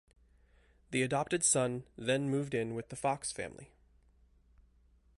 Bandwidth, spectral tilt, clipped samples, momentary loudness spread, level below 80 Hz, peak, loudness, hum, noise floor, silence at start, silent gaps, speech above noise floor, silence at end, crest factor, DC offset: 11.5 kHz; -4 dB/octave; under 0.1%; 11 LU; -66 dBFS; -16 dBFS; -34 LUFS; none; -66 dBFS; 0.9 s; none; 33 dB; 1.5 s; 20 dB; under 0.1%